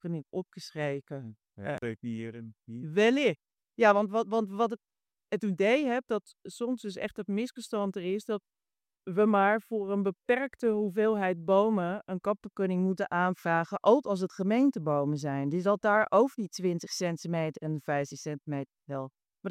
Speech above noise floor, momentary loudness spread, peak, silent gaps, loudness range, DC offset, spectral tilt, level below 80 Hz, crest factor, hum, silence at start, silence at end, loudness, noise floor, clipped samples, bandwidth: over 61 dB; 14 LU; -10 dBFS; none; 4 LU; under 0.1%; -6 dB/octave; -76 dBFS; 20 dB; none; 0.05 s; 0 s; -30 LUFS; under -90 dBFS; under 0.1%; 14.5 kHz